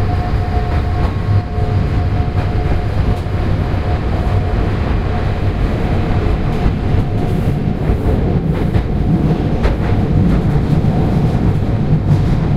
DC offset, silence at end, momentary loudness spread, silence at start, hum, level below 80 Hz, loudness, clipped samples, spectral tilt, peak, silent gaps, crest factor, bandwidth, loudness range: under 0.1%; 0 s; 4 LU; 0 s; none; -20 dBFS; -16 LUFS; under 0.1%; -9 dB/octave; 0 dBFS; none; 14 dB; 7.8 kHz; 3 LU